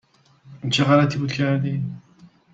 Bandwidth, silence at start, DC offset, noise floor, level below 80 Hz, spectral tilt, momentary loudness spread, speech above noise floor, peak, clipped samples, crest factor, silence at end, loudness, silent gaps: 7.8 kHz; 0.45 s; under 0.1%; -52 dBFS; -58 dBFS; -6 dB/octave; 15 LU; 32 dB; -4 dBFS; under 0.1%; 18 dB; 0.25 s; -21 LUFS; none